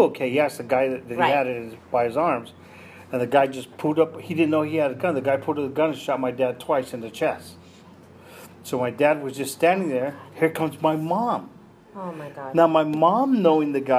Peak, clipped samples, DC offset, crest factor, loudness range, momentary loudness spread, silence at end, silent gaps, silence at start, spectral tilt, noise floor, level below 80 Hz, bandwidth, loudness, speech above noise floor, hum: -4 dBFS; under 0.1%; under 0.1%; 18 dB; 4 LU; 12 LU; 0 s; none; 0 s; -6 dB/octave; -48 dBFS; -68 dBFS; 15.5 kHz; -23 LUFS; 25 dB; none